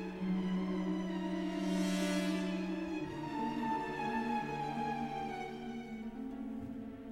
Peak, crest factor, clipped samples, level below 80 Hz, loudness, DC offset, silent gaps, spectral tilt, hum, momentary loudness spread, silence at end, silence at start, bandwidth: -24 dBFS; 14 dB; under 0.1%; -60 dBFS; -38 LUFS; under 0.1%; none; -6 dB/octave; none; 9 LU; 0 s; 0 s; 14.5 kHz